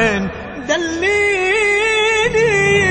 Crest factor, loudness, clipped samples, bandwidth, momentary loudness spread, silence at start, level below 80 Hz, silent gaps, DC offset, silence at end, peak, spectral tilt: 14 dB; -14 LUFS; under 0.1%; 9.2 kHz; 8 LU; 0 s; -40 dBFS; none; under 0.1%; 0 s; -2 dBFS; -3.5 dB/octave